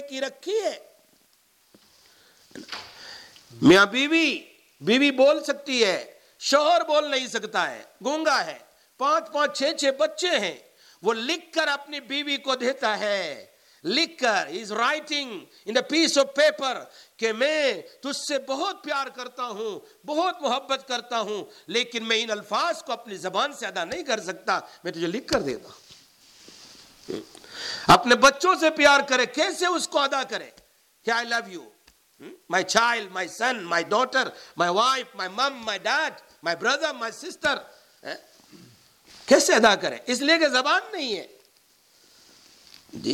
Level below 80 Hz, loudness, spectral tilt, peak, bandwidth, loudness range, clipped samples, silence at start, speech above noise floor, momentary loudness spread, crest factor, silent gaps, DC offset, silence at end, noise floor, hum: -64 dBFS; -24 LUFS; -2.5 dB/octave; -6 dBFS; 17 kHz; 8 LU; under 0.1%; 0 s; 39 dB; 16 LU; 20 dB; none; under 0.1%; 0 s; -63 dBFS; none